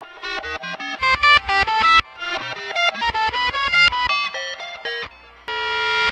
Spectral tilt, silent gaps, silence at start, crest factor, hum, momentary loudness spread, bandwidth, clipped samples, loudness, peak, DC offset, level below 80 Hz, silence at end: -1.5 dB/octave; none; 0 s; 18 dB; none; 15 LU; 10.5 kHz; under 0.1%; -18 LUFS; -2 dBFS; under 0.1%; -44 dBFS; 0 s